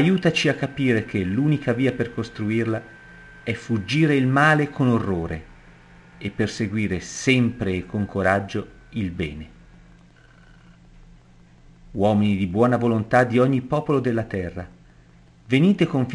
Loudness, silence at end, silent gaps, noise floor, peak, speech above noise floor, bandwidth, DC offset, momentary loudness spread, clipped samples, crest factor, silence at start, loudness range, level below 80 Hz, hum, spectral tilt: -22 LUFS; 0 s; none; -51 dBFS; -4 dBFS; 30 dB; 11.5 kHz; under 0.1%; 13 LU; under 0.1%; 18 dB; 0 s; 7 LU; -48 dBFS; none; -6.5 dB/octave